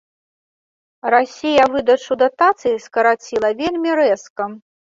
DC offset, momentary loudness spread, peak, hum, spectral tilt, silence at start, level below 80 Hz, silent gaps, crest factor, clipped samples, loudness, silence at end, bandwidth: under 0.1%; 9 LU; -2 dBFS; none; -4 dB/octave; 1.05 s; -56 dBFS; 4.30-4.36 s; 16 dB; under 0.1%; -17 LUFS; 0.3 s; 7.6 kHz